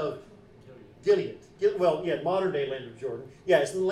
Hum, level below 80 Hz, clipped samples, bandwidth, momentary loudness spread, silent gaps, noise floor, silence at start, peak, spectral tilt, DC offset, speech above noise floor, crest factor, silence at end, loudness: none; -64 dBFS; under 0.1%; 12.5 kHz; 12 LU; none; -51 dBFS; 0 s; -10 dBFS; -5.5 dB/octave; under 0.1%; 24 dB; 20 dB; 0 s; -28 LUFS